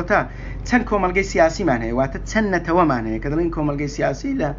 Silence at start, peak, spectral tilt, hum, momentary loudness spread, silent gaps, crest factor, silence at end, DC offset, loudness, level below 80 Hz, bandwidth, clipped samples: 0 s; -2 dBFS; -5.5 dB/octave; none; 6 LU; none; 18 dB; 0 s; under 0.1%; -20 LUFS; -32 dBFS; 7.6 kHz; under 0.1%